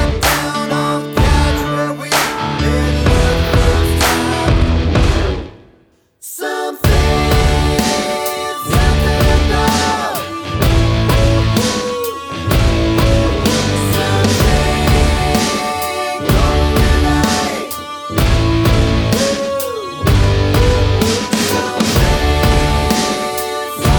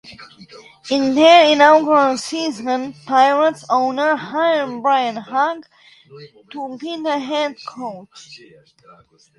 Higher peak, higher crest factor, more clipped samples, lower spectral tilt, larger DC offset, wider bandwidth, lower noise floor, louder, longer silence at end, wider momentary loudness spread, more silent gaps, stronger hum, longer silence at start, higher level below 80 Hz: about the same, 0 dBFS vs 0 dBFS; about the same, 14 dB vs 18 dB; neither; first, -5 dB/octave vs -3.5 dB/octave; neither; first, over 20 kHz vs 11.5 kHz; first, -52 dBFS vs -43 dBFS; about the same, -14 LUFS vs -16 LUFS; second, 0 s vs 1 s; second, 7 LU vs 20 LU; neither; neither; about the same, 0 s vs 0.05 s; first, -18 dBFS vs -66 dBFS